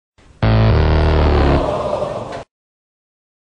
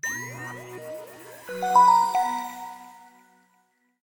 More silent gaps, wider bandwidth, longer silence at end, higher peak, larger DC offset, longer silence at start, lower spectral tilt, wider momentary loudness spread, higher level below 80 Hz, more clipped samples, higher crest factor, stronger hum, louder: neither; second, 7.8 kHz vs over 20 kHz; about the same, 1.15 s vs 1.1 s; first, -2 dBFS vs -8 dBFS; neither; first, 0.4 s vs 0.05 s; first, -8 dB/octave vs -3 dB/octave; second, 13 LU vs 24 LU; first, -22 dBFS vs -74 dBFS; neither; about the same, 16 dB vs 18 dB; neither; first, -16 LUFS vs -22 LUFS